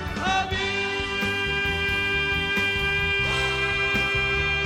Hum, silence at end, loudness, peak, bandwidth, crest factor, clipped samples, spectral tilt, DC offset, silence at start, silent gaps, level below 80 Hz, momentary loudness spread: none; 0 s; -23 LUFS; -12 dBFS; 16.5 kHz; 14 dB; under 0.1%; -4 dB/octave; under 0.1%; 0 s; none; -38 dBFS; 3 LU